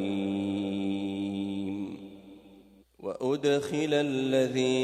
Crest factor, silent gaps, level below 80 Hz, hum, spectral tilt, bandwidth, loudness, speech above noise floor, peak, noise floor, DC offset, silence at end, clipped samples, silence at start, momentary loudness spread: 16 dB; none; -70 dBFS; none; -5.5 dB/octave; 13 kHz; -30 LUFS; 30 dB; -14 dBFS; -56 dBFS; under 0.1%; 0 s; under 0.1%; 0 s; 13 LU